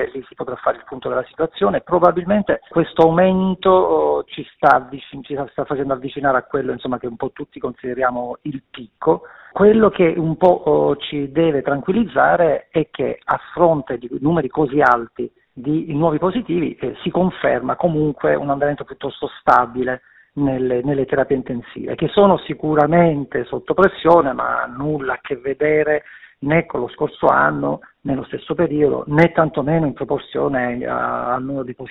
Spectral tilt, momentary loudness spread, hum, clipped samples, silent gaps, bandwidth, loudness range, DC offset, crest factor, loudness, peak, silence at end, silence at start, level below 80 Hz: -5.5 dB/octave; 13 LU; none; under 0.1%; none; 5.6 kHz; 4 LU; under 0.1%; 18 dB; -18 LUFS; 0 dBFS; 0 s; 0 s; -48 dBFS